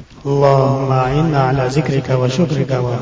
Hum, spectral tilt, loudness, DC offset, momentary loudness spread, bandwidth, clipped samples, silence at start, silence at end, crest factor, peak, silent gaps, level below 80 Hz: none; -7.5 dB/octave; -15 LUFS; under 0.1%; 5 LU; 8 kHz; under 0.1%; 0 s; 0 s; 14 dB; 0 dBFS; none; -38 dBFS